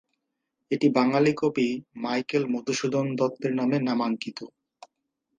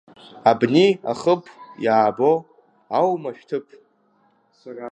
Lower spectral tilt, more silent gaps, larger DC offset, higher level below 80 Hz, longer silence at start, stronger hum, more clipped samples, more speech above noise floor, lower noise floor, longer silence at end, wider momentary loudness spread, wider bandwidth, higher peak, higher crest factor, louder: about the same, -6 dB/octave vs -6.5 dB/octave; neither; neither; about the same, -72 dBFS vs -70 dBFS; first, 0.7 s vs 0.35 s; neither; neither; first, 56 dB vs 42 dB; first, -81 dBFS vs -62 dBFS; first, 0.9 s vs 0 s; second, 10 LU vs 14 LU; about the same, 9.4 kHz vs 9.4 kHz; second, -6 dBFS vs -2 dBFS; about the same, 20 dB vs 20 dB; second, -26 LUFS vs -20 LUFS